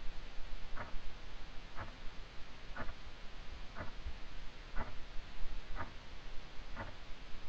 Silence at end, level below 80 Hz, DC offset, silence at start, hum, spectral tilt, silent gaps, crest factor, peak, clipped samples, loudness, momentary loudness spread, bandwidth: 0 s; -46 dBFS; 0.7%; 0 s; none; -5 dB/octave; none; 16 dB; -22 dBFS; under 0.1%; -51 LUFS; 6 LU; 7.2 kHz